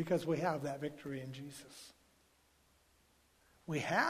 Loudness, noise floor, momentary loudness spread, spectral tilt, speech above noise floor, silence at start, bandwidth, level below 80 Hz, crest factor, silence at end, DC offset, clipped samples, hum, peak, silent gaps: -39 LUFS; -71 dBFS; 19 LU; -5.5 dB/octave; 34 dB; 0 s; 15.5 kHz; -74 dBFS; 22 dB; 0 s; under 0.1%; under 0.1%; none; -18 dBFS; none